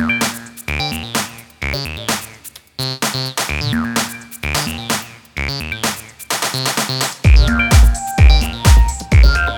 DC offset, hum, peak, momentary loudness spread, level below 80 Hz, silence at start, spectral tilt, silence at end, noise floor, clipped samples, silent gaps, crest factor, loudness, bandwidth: under 0.1%; none; 0 dBFS; 12 LU; -18 dBFS; 0 s; -4 dB/octave; 0 s; -38 dBFS; under 0.1%; none; 14 dB; -16 LUFS; 18 kHz